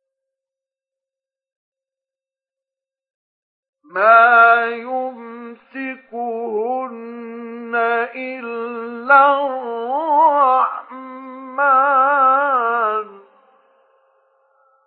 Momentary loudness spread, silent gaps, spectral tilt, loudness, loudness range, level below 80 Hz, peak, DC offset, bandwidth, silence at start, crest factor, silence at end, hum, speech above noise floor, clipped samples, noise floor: 21 LU; none; -6.5 dB/octave; -16 LUFS; 8 LU; -90 dBFS; 0 dBFS; under 0.1%; 4.7 kHz; 3.95 s; 18 dB; 1.7 s; none; over 76 dB; under 0.1%; under -90 dBFS